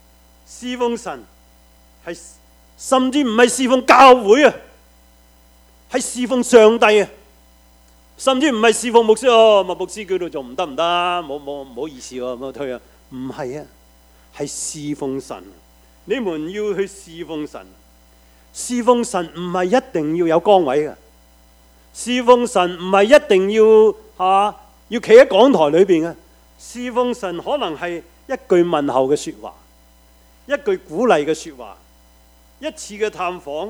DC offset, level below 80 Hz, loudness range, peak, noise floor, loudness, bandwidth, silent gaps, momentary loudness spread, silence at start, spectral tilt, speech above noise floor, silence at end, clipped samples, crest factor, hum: under 0.1%; -52 dBFS; 13 LU; 0 dBFS; -50 dBFS; -16 LUFS; 16 kHz; none; 20 LU; 0.5 s; -4 dB/octave; 34 dB; 0 s; under 0.1%; 18 dB; none